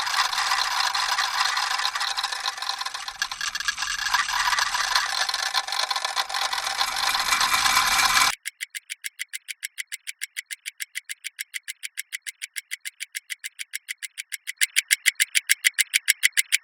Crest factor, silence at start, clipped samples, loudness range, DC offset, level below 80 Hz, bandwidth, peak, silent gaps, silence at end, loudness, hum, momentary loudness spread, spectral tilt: 26 dB; 0 s; under 0.1%; 12 LU; under 0.1%; -58 dBFS; over 20 kHz; 0 dBFS; none; 0.05 s; -24 LUFS; none; 14 LU; 3 dB/octave